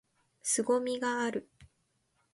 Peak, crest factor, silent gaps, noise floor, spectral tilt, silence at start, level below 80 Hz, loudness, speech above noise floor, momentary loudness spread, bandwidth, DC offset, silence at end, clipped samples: -18 dBFS; 18 dB; none; -76 dBFS; -2.5 dB/octave; 0.45 s; -72 dBFS; -32 LUFS; 45 dB; 9 LU; 11.5 kHz; under 0.1%; 0.7 s; under 0.1%